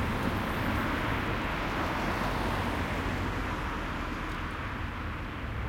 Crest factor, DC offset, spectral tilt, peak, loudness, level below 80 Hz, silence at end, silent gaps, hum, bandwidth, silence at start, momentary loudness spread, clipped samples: 14 dB; under 0.1%; -6 dB/octave; -18 dBFS; -32 LUFS; -40 dBFS; 0 s; none; none; 16.5 kHz; 0 s; 6 LU; under 0.1%